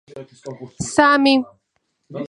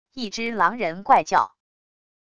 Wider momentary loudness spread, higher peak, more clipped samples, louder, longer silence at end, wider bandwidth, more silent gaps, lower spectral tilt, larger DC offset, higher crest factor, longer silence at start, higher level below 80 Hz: first, 23 LU vs 11 LU; first, 0 dBFS vs -4 dBFS; neither; first, -16 LUFS vs -22 LUFS; second, 0.05 s vs 0.75 s; about the same, 11 kHz vs 10 kHz; neither; about the same, -4 dB/octave vs -3.5 dB/octave; neither; about the same, 20 dB vs 20 dB; about the same, 0.15 s vs 0.15 s; about the same, -56 dBFS vs -60 dBFS